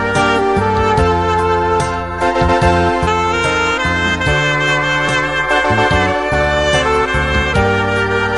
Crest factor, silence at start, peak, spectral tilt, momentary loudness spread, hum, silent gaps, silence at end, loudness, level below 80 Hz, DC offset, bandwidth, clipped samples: 14 dB; 0 s; 0 dBFS; -5 dB/octave; 2 LU; none; none; 0 s; -14 LUFS; -26 dBFS; 0.8%; 11.5 kHz; under 0.1%